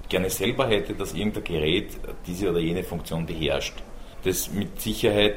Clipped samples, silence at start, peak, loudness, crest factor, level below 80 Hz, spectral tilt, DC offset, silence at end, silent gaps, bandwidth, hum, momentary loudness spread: under 0.1%; 0 s; -6 dBFS; -26 LUFS; 20 dB; -38 dBFS; -4.5 dB/octave; under 0.1%; 0 s; none; 16.5 kHz; none; 10 LU